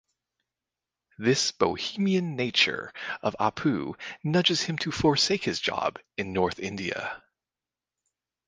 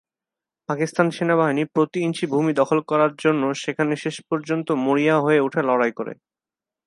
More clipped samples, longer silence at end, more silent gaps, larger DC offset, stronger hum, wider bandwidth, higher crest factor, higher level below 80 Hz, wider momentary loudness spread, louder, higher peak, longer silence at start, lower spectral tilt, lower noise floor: neither; first, 1.3 s vs 0.75 s; neither; neither; neither; second, 10 kHz vs 11.5 kHz; about the same, 22 dB vs 20 dB; first, -58 dBFS vs -72 dBFS; first, 12 LU vs 8 LU; second, -27 LUFS vs -21 LUFS; second, -8 dBFS vs -2 dBFS; first, 1.2 s vs 0.7 s; second, -4 dB/octave vs -6 dB/octave; about the same, under -90 dBFS vs -89 dBFS